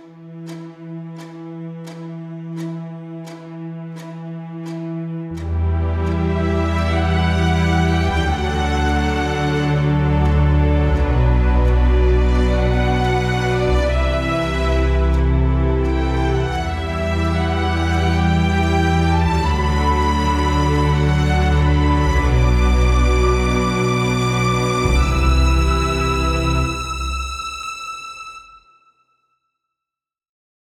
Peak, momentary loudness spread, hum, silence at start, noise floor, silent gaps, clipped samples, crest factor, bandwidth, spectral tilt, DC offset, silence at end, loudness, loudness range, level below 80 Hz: -4 dBFS; 15 LU; none; 0 s; -88 dBFS; none; under 0.1%; 14 dB; 11.5 kHz; -6.5 dB/octave; under 0.1%; 2.2 s; -18 LUFS; 13 LU; -22 dBFS